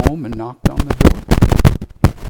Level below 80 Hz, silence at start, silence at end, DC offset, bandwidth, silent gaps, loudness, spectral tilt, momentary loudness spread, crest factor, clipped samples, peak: -20 dBFS; 0 s; 0 s; under 0.1%; 19 kHz; none; -15 LUFS; -7 dB/octave; 8 LU; 14 dB; 0.9%; 0 dBFS